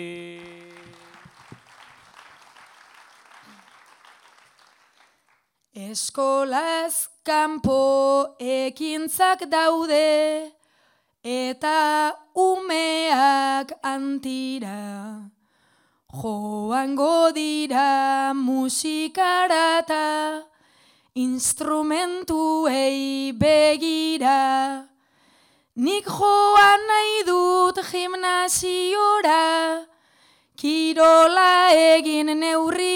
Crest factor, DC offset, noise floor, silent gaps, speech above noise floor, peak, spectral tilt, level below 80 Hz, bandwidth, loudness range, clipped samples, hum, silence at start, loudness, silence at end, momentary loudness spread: 16 dB; under 0.1%; -67 dBFS; none; 47 dB; -6 dBFS; -2.5 dB/octave; -60 dBFS; 17.5 kHz; 7 LU; under 0.1%; none; 0 s; -20 LUFS; 0 s; 15 LU